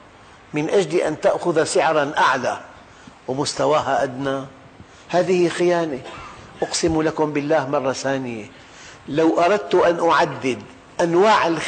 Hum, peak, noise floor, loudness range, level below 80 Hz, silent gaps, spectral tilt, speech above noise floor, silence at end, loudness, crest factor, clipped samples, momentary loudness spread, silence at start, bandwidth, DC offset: none; -6 dBFS; -46 dBFS; 3 LU; -54 dBFS; none; -4.5 dB/octave; 27 dB; 0 s; -20 LUFS; 14 dB; under 0.1%; 15 LU; 0.5 s; 9.4 kHz; under 0.1%